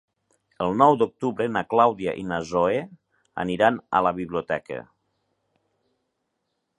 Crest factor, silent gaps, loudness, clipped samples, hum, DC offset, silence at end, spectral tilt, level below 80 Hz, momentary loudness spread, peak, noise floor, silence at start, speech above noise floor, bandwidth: 24 dB; none; -23 LUFS; under 0.1%; none; under 0.1%; 1.95 s; -6.5 dB/octave; -58 dBFS; 12 LU; -2 dBFS; -77 dBFS; 0.6 s; 55 dB; 10.5 kHz